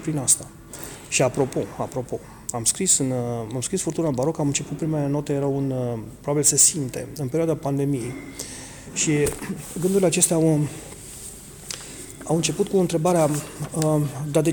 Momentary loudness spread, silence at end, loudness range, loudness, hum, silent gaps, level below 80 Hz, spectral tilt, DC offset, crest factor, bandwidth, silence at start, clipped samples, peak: 16 LU; 0 s; 3 LU; -22 LUFS; none; none; -50 dBFS; -4.5 dB/octave; under 0.1%; 16 dB; over 20 kHz; 0 s; under 0.1%; -8 dBFS